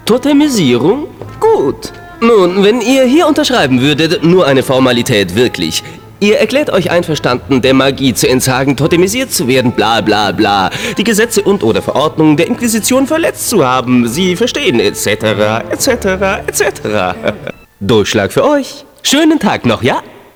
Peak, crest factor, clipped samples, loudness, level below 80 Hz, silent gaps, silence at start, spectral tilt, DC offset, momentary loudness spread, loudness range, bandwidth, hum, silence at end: 0 dBFS; 10 dB; under 0.1%; -11 LUFS; -40 dBFS; none; 0.05 s; -4.5 dB/octave; under 0.1%; 6 LU; 3 LU; over 20 kHz; none; 0.25 s